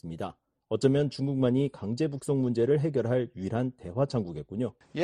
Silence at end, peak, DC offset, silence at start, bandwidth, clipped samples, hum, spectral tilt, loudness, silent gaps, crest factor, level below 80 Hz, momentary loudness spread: 0 s; -10 dBFS; under 0.1%; 0.05 s; 11 kHz; under 0.1%; none; -8 dB/octave; -29 LUFS; none; 20 dB; -60 dBFS; 9 LU